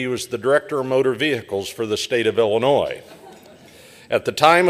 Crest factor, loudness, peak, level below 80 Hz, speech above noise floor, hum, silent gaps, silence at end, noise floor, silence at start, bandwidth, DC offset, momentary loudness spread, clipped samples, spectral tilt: 18 dB; -20 LUFS; 0 dBFS; -60 dBFS; 26 dB; none; none; 0 s; -45 dBFS; 0 s; 15.5 kHz; under 0.1%; 8 LU; under 0.1%; -4.5 dB/octave